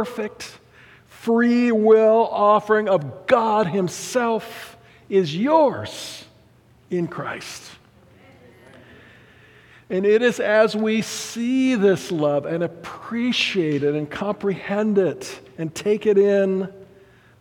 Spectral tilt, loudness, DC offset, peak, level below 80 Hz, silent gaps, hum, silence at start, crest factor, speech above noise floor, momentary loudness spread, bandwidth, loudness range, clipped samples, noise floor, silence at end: -5.5 dB/octave; -20 LUFS; under 0.1%; -2 dBFS; -64 dBFS; none; none; 0 s; 18 dB; 34 dB; 16 LU; 17 kHz; 11 LU; under 0.1%; -54 dBFS; 0.55 s